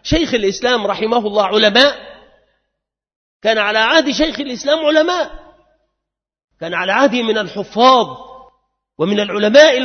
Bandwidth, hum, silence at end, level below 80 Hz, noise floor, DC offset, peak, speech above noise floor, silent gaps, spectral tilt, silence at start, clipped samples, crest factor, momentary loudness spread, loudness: 6.6 kHz; none; 0 s; -42 dBFS; -80 dBFS; under 0.1%; 0 dBFS; 67 dB; 3.16-3.40 s, 6.44-6.48 s; -3.5 dB/octave; 0.05 s; under 0.1%; 16 dB; 12 LU; -14 LUFS